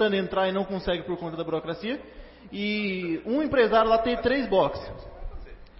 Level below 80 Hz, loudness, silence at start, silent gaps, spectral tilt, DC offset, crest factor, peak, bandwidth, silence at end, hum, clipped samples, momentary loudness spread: -46 dBFS; -26 LUFS; 0 s; none; -9.5 dB/octave; under 0.1%; 18 dB; -8 dBFS; 5.8 kHz; 0.1 s; none; under 0.1%; 20 LU